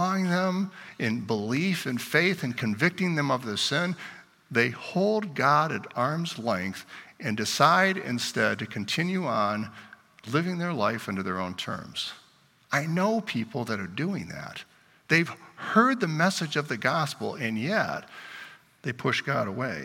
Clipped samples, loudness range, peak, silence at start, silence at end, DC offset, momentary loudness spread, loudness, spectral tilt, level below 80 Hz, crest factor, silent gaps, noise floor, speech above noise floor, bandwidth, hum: under 0.1%; 4 LU; -4 dBFS; 0 s; 0 s; under 0.1%; 13 LU; -27 LUFS; -5 dB/octave; -70 dBFS; 22 dB; none; -60 dBFS; 33 dB; 17 kHz; none